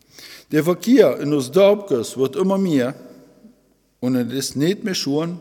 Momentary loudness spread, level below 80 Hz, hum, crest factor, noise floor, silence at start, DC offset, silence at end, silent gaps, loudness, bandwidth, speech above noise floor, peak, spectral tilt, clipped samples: 11 LU; -66 dBFS; none; 18 dB; -60 dBFS; 0.2 s; under 0.1%; 0 s; none; -19 LUFS; 18 kHz; 42 dB; -2 dBFS; -5.5 dB/octave; under 0.1%